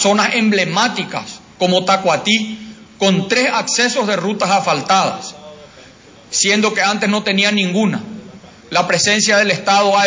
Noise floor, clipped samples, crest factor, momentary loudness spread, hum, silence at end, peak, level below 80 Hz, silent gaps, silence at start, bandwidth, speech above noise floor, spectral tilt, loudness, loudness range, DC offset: -42 dBFS; under 0.1%; 16 dB; 12 LU; none; 0 s; 0 dBFS; -60 dBFS; none; 0 s; 7.8 kHz; 27 dB; -3 dB/octave; -14 LUFS; 2 LU; under 0.1%